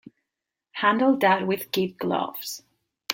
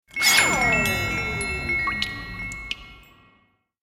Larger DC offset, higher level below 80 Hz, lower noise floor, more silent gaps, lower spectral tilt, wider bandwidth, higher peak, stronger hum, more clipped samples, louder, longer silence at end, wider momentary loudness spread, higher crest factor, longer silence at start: neither; second, -70 dBFS vs -42 dBFS; first, -86 dBFS vs -64 dBFS; neither; first, -4.5 dB/octave vs -2 dB/octave; about the same, 17 kHz vs 16.5 kHz; about the same, -2 dBFS vs -4 dBFS; neither; neither; second, -24 LUFS vs -21 LUFS; second, 0 s vs 0.8 s; about the same, 18 LU vs 16 LU; about the same, 24 dB vs 22 dB; first, 0.75 s vs 0.15 s